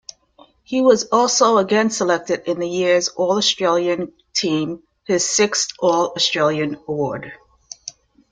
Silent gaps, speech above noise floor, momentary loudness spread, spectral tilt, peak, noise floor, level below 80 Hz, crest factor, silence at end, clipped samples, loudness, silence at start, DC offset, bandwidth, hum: none; 34 dB; 15 LU; -3 dB/octave; -2 dBFS; -52 dBFS; -62 dBFS; 18 dB; 0.4 s; under 0.1%; -18 LUFS; 0.7 s; under 0.1%; 9.6 kHz; none